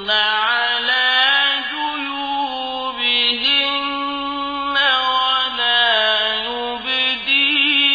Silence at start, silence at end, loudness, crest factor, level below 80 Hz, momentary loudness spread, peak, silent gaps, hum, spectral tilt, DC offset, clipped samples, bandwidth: 0 s; 0 s; -16 LUFS; 14 dB; -54 dBFS; 10 LU; -4 dBFS; none; none; -2 dB/octave; under 0.1%; under 0.1%; 5 kHz